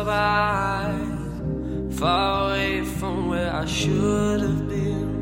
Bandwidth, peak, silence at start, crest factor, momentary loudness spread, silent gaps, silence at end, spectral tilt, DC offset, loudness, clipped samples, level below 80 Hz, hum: 16.5 kHz; -8 dBFS; 0 s; 16 dB; 8 LU; none; 0 s; -5.5 dB/octave; under 0.1%; -24 LUFS; under 0.1%; -36 dBFS; none